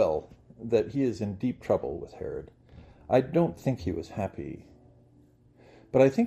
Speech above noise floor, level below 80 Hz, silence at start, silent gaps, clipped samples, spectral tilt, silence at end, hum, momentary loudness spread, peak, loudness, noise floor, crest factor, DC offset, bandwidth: 32 dB; -56 dBFS; 0 s; none; under 0.1%; -8 dB/octave; 0 s; none; 17 LU; -8 dBFS; -29 LUFS; -59 dBFS; 22 dB; under 0.1%; 14 kHz